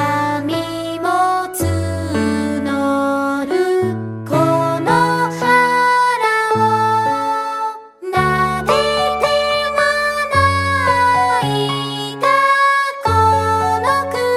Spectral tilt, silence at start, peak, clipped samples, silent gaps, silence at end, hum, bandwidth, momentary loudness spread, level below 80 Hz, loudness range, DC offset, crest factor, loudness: -5 dB/octave; 0 s; 0 dBFS; under 0.1%; none; 0 s; none; 16 kHz; 7 LU; -48 dBFS; 3 LU; under 0.1%; 16 dB; -16 LUFS